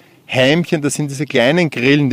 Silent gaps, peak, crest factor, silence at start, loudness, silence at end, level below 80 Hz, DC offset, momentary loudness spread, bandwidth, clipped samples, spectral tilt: none; 0 dBFS; 14 dB; 0.3 s; -15 LUFS; 0 s; -54 dBFS; under 0.1%; 7 LU; 15.5 kHz; under 0.1%; -5 dB/octave